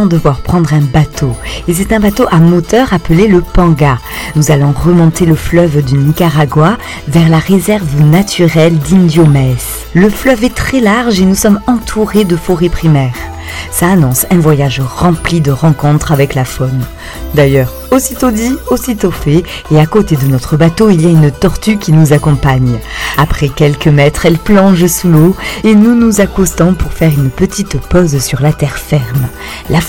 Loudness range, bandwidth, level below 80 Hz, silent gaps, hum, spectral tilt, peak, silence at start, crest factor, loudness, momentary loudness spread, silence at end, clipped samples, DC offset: 3 LU; 17.5 kHz; -24 dBFS; none; none; -6 dB/octave; 0 dBFS; 0 s; 8 dB; -9 LUFS; 7 LU; 0 s; 1%; 0.7%